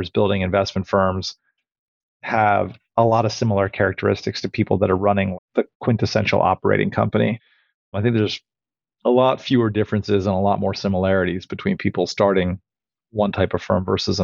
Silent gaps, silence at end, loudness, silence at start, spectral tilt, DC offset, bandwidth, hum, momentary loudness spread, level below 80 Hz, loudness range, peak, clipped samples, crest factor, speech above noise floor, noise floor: 1.79-2.20 s, 5.38-5.48 s, 5.75-5.80 s, 7.74-7.92 s; 0 s; -20 LUFS; 0 s; -6.5 dB/octave; under 0.1%; 7.4 kHz; none; 7 LU; -52 dBFS; 1 LU; -4 dBFS; under 0.1%; 16 dB; over 71 dB; under -90 dBFS